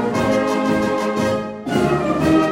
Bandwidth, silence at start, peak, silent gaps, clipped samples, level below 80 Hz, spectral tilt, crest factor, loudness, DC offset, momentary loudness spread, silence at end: 16.5 kHz; 0 s; -4 dBFS; none; under 0.1%; -42 dBFS; -6 dB/octave; 14 dB; -19 LUFS; under 0.1%; 5 LU; 0 s